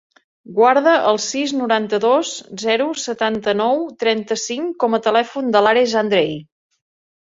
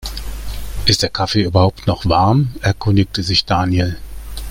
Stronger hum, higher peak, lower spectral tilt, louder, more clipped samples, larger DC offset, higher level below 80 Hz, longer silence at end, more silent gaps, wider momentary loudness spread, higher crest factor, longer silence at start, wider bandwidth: neither; about the same, -2 dBFS vs 0 dBFS; second, -3.5 dB/octave vs -5.5 dB/octave; about the same, -17 LUFS vs -16 LUFS; neither; neither; second, -64 dBFS vs -30 dBFS; first, 0.85 s vs 0 s; neither; second, 9 LU vs 15 LU; about the same, 16 dB vs 16 dB; first, 0.5 s vs 0 s; second, 7.8 kHz vs 16.5 kHz